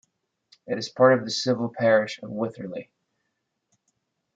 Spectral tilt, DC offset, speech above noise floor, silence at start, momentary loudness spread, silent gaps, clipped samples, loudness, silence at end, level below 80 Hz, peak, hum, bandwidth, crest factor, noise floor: -5 dB/octave; under 0.1%; 55 dB; 0.65 s; 16 LU; none; under 0.1%; -24 LUFS; 1.55 s; -74 dBFS; -4 dBFS; none; 7.8 kHz; 22 dB; -78 dBFS